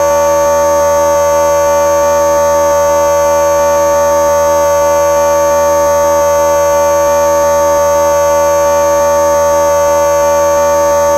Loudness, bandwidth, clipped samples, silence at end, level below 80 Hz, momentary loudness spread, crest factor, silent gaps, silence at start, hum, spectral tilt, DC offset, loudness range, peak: -9 LUFS; 16 kHz; under 0.1%; 0 s; -34 dBFS; 0 LU; 8 dB; none; 0 s; none; -3 dB/octave; under 0.1%; 0 LU; 0 dBFS